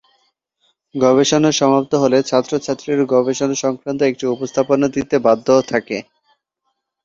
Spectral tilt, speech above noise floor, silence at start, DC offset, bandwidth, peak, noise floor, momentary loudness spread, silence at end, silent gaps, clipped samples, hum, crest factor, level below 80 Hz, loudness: -4.5 dB/octave; 57 dB; 0.95 s; under 0.1%; 7.8 kHz; -2 dBFS; -73 dBFS; 8 LU; 1 s; none; under 0.1%; none; 16 dB; -56 dBFS; -16 LUFS